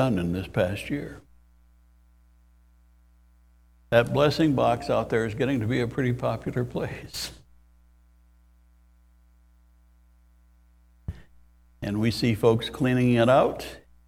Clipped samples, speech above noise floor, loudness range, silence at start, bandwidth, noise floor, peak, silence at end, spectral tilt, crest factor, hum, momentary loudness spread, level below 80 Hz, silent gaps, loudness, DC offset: under 0.1%; 34 dB; 15 LU; 0 s; 16 kHz; -58 dBFS; -4 dBFS; 0.3 s; -6.5 dB/octave; 24 dB; none; 16 LU; -50 dBFS; none; -25 LUFS; under 0.1%